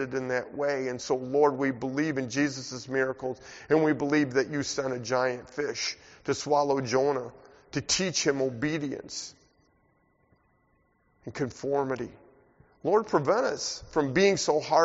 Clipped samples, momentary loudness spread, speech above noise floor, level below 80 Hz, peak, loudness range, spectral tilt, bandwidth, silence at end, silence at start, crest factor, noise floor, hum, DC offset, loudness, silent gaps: under 0.1%; 11 LU; 41 dB; -62 dBFS; -10 dBFS; 9 LU; -4 dB/octave; 8 kHz; 0 s; 0 s; 20 dB; -69 dBFS; none; under 0.1%; -28 LUFS; none